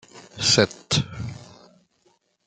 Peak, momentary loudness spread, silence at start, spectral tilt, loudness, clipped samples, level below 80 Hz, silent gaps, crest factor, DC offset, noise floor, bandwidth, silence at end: -2 dBFS; 23 LU; 0.15 s; -3 dB/octave; -21 LUFS; under 0.1%; -54 dBFS; none; 24 dB; under 0.1%; -65 dBFS; 11 kHz; 1 s